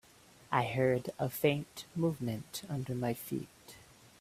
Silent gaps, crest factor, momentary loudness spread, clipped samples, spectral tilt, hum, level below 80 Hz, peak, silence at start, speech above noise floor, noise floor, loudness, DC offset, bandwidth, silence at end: none; 22 dB; 15 LU; under 0.1%; -6 dB/octave; none; -68 dBFS; -14 dBFS; 0.5 s; 26 dB; -60 dBFS; -35 LUFS; under 0.1%; 16 kHz; 0.4 s